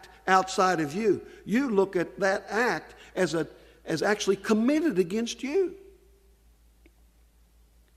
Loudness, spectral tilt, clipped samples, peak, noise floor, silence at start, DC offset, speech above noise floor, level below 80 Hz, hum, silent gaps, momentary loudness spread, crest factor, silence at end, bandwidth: -27 LUFS; -4.5 dB/octave; under 0.1%; -6 dBFS; -60 dBFS; 0.05 s; under 0.1%; 34 dB; -60 dBFS; 60 Hz at -60 dBFS; none; 8 LU; 22 dB; 2.2 s; 14.5 kHz